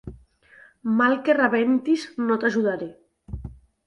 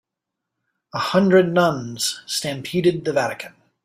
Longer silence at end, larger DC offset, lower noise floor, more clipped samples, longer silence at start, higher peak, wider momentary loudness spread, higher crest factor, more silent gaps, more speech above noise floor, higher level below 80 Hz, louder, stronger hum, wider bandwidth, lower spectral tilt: about the same, 0.35 s vs 0.35 s; neither; second, -53 dBFS vs -83 dBFS; neither; second, 0.05 s vs 0.95 s; second, -8 dBFS vs -4 dBFS; first, 19 LU vs 12 LU; about the same, 16 dB vs 18 dB; neither; second, 32 dB vs 63 dB; first, -48 dBFS vs -62 dBFS; about the same, -22 LUFS vs -20 LUFS; neither; second, 10.5 kHz vs 16 kHz; first, -6.5 dB/octave vs -4.5 dB/octave